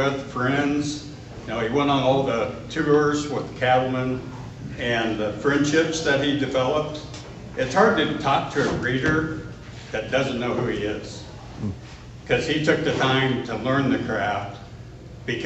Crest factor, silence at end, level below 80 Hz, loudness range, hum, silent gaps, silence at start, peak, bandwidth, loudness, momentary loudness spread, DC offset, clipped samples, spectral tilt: 20 dB; 0 s; -46 dBFS; 3 LU; none; none; 0 s; -4 dBFS; 8.4 kHz; -23 LUFS; 17 LU; under 0.1%; under 0.1%; -5.5 dB/octave